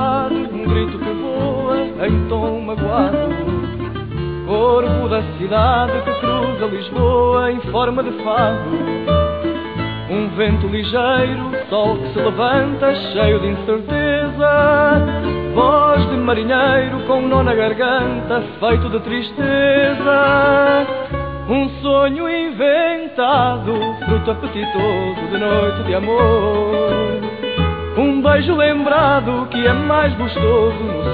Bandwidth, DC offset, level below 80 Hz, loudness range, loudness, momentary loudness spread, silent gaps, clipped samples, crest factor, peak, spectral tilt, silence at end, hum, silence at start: 4.9 kHz; 0.3%; -32 dBFS; 4 LU; -16 LUFS; 8 LU; none; under 0.1%; 14 dB; -2 dBFS; -10 dB/octave; 0 s; none; 0 s